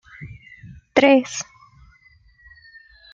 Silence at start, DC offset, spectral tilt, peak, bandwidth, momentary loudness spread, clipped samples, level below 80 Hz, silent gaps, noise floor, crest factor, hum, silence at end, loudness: 0.2 s; under 0.1%; -4 dB/octave; 0 dBFS; 7.8 kHz; 27 LU; under 0.1%; -56 dBFS; none; -54 dBFS; 22 dB; none; 1.7 s; -18 LUFS